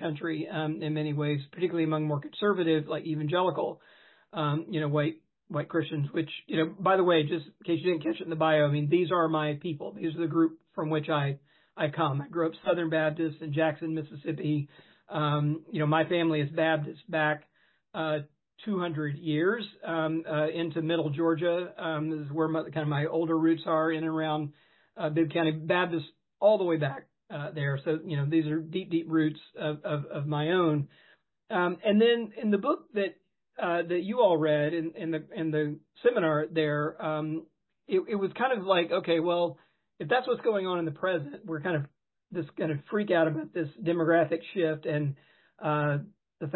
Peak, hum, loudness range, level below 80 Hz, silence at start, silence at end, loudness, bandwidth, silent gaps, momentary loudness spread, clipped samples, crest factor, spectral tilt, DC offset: -12 dBFS; none; 3 LU; -76 dBFS; 0 s; 0 s; -29 LUFS; 4.3 kHz; none; 9 LU; under 0.1%; 18 dB; -11 dB/octave; under 0.1%